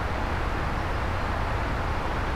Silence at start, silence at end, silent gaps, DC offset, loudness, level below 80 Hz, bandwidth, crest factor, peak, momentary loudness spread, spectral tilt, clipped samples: 0 s; 0 s; none; under 0.1%; -29 LUFS; -32 dBFS; 15 kHz; 12 dB; -14 dBFS; 0 LU; -6 dB/octave; under 0.1%